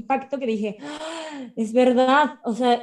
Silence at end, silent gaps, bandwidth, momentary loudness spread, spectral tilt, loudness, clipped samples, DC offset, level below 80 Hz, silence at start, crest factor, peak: 0 s; none; 11 kHz; 15 LU; -5 dB/octave; -22 LUFS; under 0.1%; under 0.1%; -70 dBFS; 0 s; 14 dB; -6 dBFS